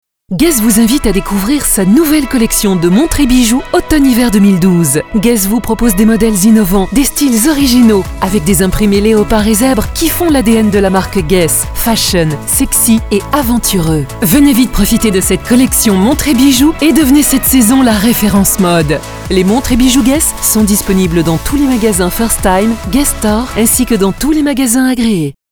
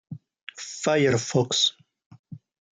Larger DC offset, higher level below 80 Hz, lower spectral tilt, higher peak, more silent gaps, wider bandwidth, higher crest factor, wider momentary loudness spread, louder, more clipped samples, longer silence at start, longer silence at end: neither; first, -22 dBFS vs -66 dBFS; about the same, -4.5 dB/octave vs -3.5 dB/octave; first, 0 dBFS vs -8 dBFS; second, none vs 0.43-0.47 s, 2.06-2.11 s, 2.19-2.24 s; first, over 20 kHz vs 9.6 kHz; second, 8 dB vs 18 dB; second, 5 LU vs 21 LU; first, -9 LUFS vs -23 LUFS; first, 0.3% vs under 0.1%; first, 0.3 s vs 0.1 s; second, 0.2 s vs 0.35 s